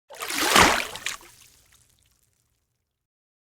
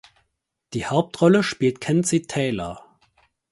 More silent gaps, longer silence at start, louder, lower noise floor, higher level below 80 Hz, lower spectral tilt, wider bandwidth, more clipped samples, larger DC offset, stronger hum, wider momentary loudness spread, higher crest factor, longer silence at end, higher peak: neither; second, 0.1 s vs 0.7 s; about the same, -21 LUFS vs -22 LUFS; about the same, -77 dBFS vs -76 dBFS; first, -48 dBFS vs -54 dBFS; second, -1.5 dB/octave vs -5.5 dB/octave; first, over 20 kHz vs 11.5 kHz; neither; neither; neither; about the same, 16 LU vs 14 LU; first, 26 dB vs 20 dB; first, 2.25 s vs 0.7 s; about the same, -2 dBFS vs -4 dBFS